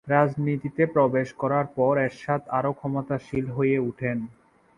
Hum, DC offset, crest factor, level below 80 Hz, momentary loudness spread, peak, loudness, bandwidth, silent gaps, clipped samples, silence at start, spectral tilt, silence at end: none; under 0.1%; 20 dB; -58 dBFS; 8 LU; -4 dBFS; -25 LUFS; 10.5 kHz; none; under 0.1%; 0.05 s; -9 dB/octave; 0.45 s